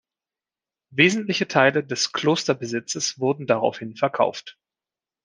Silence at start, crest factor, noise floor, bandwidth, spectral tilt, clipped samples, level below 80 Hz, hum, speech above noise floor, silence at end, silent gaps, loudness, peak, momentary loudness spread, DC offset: 0.9 s; 22 dB; under -90 dBFS; 10.5 kHz; -4 dB/octave; under 0.1%; -70 dBFS; none; over 68 dB; 0.75 s; none; -22 LUFS; -2 dBFS; 8 LU; under 0.1%